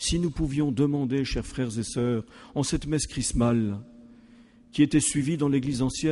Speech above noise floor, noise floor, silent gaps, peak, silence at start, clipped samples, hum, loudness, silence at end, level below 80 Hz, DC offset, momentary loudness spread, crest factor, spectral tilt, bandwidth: 28 dB; -53 dBFS; none; -10 dBFS; 0 s; under 0.1%; none; -26 LUFS; 0 s; -42 dBFS; under 0.1%; 8 LU; 16 dB; -5 dB/octave; 11.5 kHz